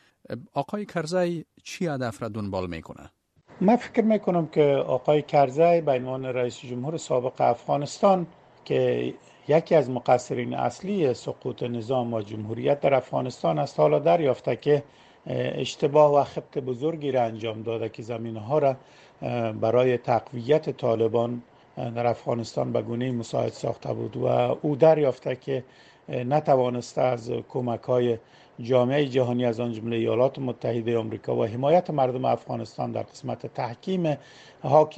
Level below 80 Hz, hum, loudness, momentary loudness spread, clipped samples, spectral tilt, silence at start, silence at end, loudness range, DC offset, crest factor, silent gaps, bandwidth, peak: -64 dBFS; none; -25 LUFS; 12 LU; under 0.1%; -7 dB/octave; 0.3 s; 0 s; 4 LU; under 0.1%; 20 dB; none; 9.8 kHz; -4 dBFS